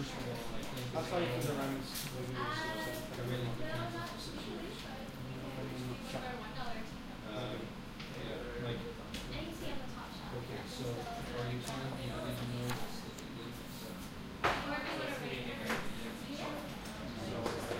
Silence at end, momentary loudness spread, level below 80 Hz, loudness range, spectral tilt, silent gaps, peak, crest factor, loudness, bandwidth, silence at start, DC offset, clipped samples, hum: 0 s; 8 LU; -54 dBFS; 5 LU; -5 dB/octave; none; -18 dBFS; 22 dB; -41 LUFS; 16 kHz; 0 s; under 0.1%; under 0.1%; none